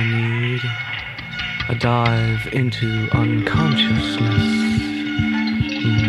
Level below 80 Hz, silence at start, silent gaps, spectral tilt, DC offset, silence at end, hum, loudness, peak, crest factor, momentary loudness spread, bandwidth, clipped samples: -38 dBFS; 0 s; none; -6.5 dB/octave; under 0.1%; 0 s; none; -19 LUFS; -4 dBFS; 16 dB; 7 LU; 11.5 kHz; under 0.1%